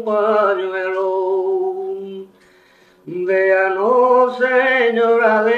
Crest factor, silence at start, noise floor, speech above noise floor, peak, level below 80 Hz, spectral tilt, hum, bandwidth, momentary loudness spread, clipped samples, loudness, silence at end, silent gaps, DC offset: 14 dB; 0 s; -51 dBFS; 36 dB; -2 dBFS; -68 dBFS; -6 dB/octave; none; 7 kHz; 13 LU; under 0.1%; -16 LUFS; 0 s; none; under 0.1%